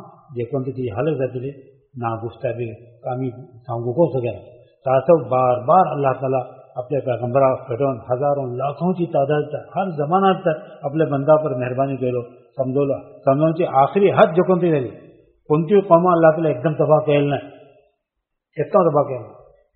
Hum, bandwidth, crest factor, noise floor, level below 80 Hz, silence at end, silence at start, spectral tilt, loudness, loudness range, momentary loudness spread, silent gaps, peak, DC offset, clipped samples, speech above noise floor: none; 4.3 kHz; 20 dB; -79 dBFS; -60 dBFS; 0.45 s; 0 s; -7 dB/octave; -19 LUFS; 8 LU; 14 LU; none; 0 dBFS; under 0.1%; under 0.1%; 60 dB